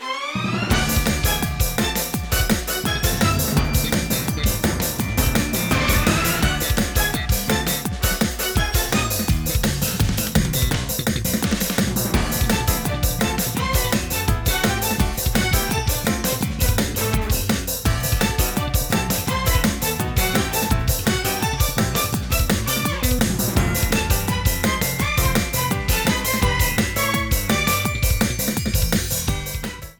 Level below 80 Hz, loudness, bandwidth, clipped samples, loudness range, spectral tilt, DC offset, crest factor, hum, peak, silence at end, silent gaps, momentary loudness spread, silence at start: -26 dBFS; -20 LUFS; over 20 kHz; under 0.1%; 1 LU; -4 dB/octave; under 0.1%; 16 dB; none; -4 dBFS; 0.05 s; none; 3 LU; 0 s